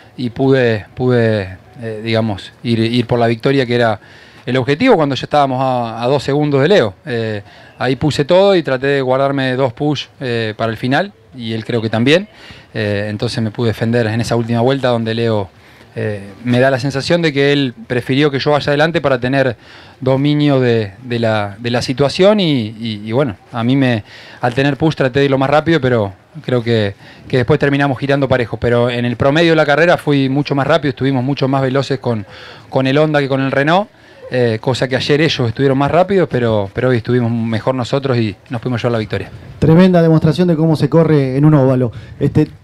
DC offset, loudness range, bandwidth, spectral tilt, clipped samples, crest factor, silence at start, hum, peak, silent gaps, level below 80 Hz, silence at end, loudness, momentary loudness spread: under 0.1%; 4 LU; 12.5 kHz; -7 dB/octave; under 0.1%; 14 dB; 0.2 s; none; 0 dBFS; none; -46 dBFS; 0.05 s; -14 LUFS; 10 LU